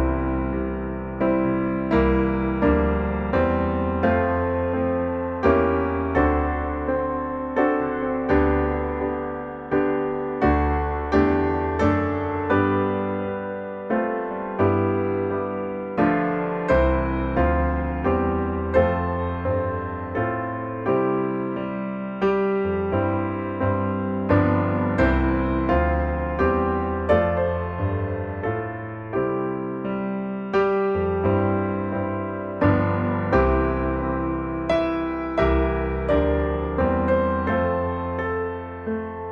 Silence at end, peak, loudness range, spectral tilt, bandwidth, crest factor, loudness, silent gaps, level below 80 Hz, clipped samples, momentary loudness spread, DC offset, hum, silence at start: 0 s; -6 dBFS; 3 LU; -9.5 dB/octave; 6.6 kHz; 16 dB; -23 LUFS; none; -32 dBFS; under 0.1%; 7 LU; under 0.1%; none; 0 s